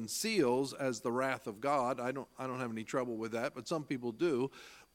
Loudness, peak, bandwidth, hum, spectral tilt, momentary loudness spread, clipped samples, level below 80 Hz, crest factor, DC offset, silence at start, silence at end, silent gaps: -36 LUFS; -18 dBFS; 17 kHz; none; -4.5 dB/octave; 8 LU; under 0.1%; -76 dBFS; 18 dB; under 0.1%; 0 s; 0.1 s; none